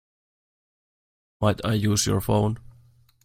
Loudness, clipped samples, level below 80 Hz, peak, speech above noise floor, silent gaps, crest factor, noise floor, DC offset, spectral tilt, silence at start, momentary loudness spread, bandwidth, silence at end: -24 LUFS; under 0.1%; -48 dBFS; -8 dBFS; 34 dB; none; 20 dB; -56 dBFS; under 0.1%; -5 dB/octave; 1.4 s; 5 LU; 16.5 kHz; 0.65 s